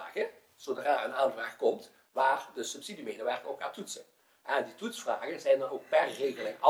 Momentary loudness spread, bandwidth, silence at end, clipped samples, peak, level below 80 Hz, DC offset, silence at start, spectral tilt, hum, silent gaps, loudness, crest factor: 12 LU; 18 kHz; 0 s; under 0.1%; -6 dBFS; -90 dBFS; under 0.1%; 0 s; -2.5 dB/octave; none; none; -33 LUFS; 26 dB